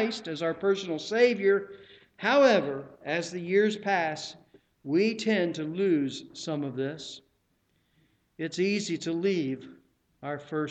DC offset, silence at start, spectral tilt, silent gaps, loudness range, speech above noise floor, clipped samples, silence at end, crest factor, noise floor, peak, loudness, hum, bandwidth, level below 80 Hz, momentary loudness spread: under 0.1%; 0 s; -5 dB/octave; none; 7 LU; 44 dB; under 0.1%; 0 s; 18 dB; -72 dBFS; -10 dBFS; -28 LUFS; none; 8.8 kHz; -74 dBFS; 15 LU